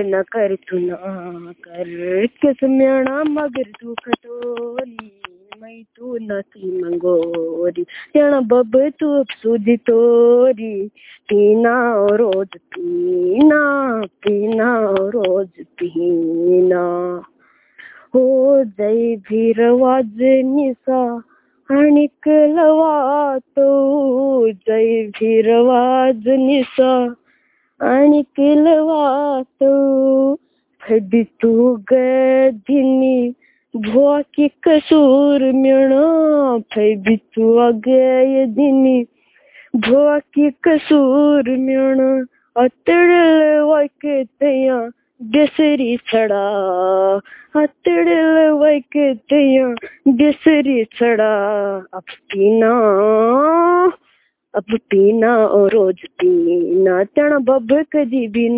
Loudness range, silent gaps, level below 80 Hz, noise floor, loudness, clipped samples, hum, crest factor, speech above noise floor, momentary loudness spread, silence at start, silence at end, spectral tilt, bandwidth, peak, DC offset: 5 LU; none; -60 dBFS; -60 dBFS; -15 LUFS; under 0.1%; none; 14 dB; 45 dB; 12 LU; 0 s; 0 s; -10 dB/octave; 4 kHz; 0 dBFS; under 0.1%